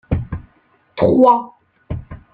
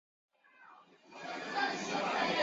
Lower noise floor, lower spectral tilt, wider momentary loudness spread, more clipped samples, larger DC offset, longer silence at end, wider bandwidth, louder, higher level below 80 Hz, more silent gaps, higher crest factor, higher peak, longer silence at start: about the same, -57 dBFS vs -60 dBFS; first, -10.5 dB/octave vs -1 dB/octave; first, 21 LU vs 15 LU; neither; neither; first, 0.2 s vs 0 s; second, 4.9 kHz vs 7.6 kHz; first, -15 LUFS vs -35 LUFS; first, -36 dBFS vs -78 dBFS; neither; about the same, 16 dB vs 18 dB; first, -2 dBFS vs -20 dBFS; second, 0.1 s vs 0.6 s